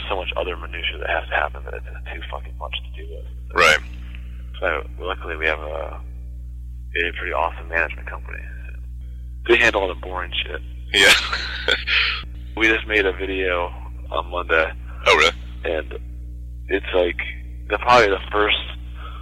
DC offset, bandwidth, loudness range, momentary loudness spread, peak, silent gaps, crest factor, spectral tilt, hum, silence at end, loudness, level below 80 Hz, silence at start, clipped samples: under 0.1%; 15.5 kHz; 8 LU; 21 LU; -4 dBFS; none; 18 dB; -3.5 dB/octave; 60 Hz at -35 dBFS; 0 s; -20 LUFS; -32 dBFS; 0 s; under 0.1%